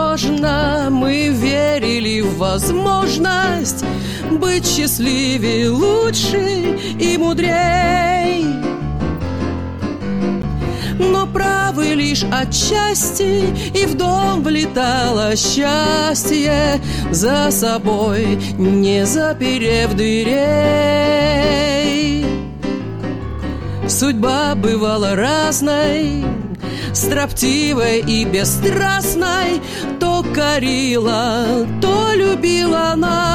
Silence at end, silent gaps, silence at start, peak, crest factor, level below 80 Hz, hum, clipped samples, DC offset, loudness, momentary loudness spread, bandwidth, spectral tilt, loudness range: 0 s; none; 0 s; -2 dBFS; 12 dB; -32 dBFS; none; under 0.1%; 1%; -16 LUFS; 7 LU; 16.5 kHz; -4 dB/octave; 3 LU